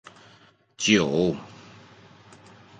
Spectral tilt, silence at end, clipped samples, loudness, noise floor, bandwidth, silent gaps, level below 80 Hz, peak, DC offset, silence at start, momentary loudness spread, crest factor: -4 dB/octave; 1.3 s; under 0.1%; -23 LUFS; -57 dBFS; 9.4 kHz; none; -58 dBFS; -6 dBFS; under 0.1%; 0.8 s; 18 LU; 22 dB